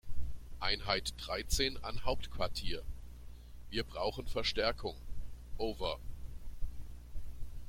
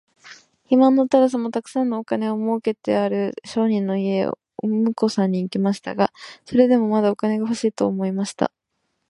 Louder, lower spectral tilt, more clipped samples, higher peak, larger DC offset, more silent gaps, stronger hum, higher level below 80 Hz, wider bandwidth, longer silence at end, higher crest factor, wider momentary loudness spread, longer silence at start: second, -38 LUFS vs -21 LUFS; second, -3.5 dB/octave vs -6.5 dB/octave; neither; second, -16 dBFS vs -2 dBFS; neither; neither; first, 60 Hz at -50 dBFS vs none; first, -44 dBFS vs -66 dBFS; first, 16.5 kHz vs 11.5 kHz; second, 0 s vs 0.6 s; about the same, 20 dB vs 18 dB; first, 18 LU vs 9 LU; second, 0.05 s vs 0.25 s